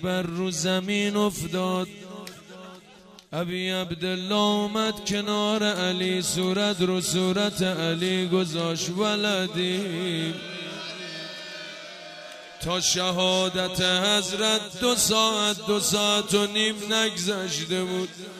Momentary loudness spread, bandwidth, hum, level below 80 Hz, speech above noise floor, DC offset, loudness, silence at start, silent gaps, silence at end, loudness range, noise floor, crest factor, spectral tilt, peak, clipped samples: 14 LU; 15.5 kHz; none; -58 dBFS; 25 dB; under 0.1%; -24 LUFS; 0 s; none; 0 s; 7 LU; -50 dBFS; 18 dB; -3.5 dB/octave; -8 dBFS; under 0.1%